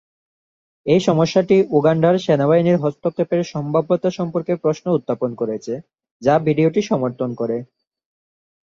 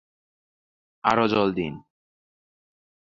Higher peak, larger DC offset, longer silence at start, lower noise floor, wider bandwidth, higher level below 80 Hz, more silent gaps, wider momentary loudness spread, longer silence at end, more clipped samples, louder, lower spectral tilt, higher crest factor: about the same, -2 dBFS vs -4 dBFS; neither; second, 0.85 s vs 1.05 s; about the same, under -90 dBFS vs under -90 dBFS; about the same, 7.6 kHz vs 7.6 kHz; about the same, -58 dBFS vs -58 dBFS; first, 6.11-6.20 s vs none; second, 9 LU vs 12 LU; second, 1 s vs 1.25 s; neither; first, -18 LUFS vs -24 LUFS; about the same, -7.5 dB/octave vs -6.5 dB/octave; second, 16 dB vs 24 dB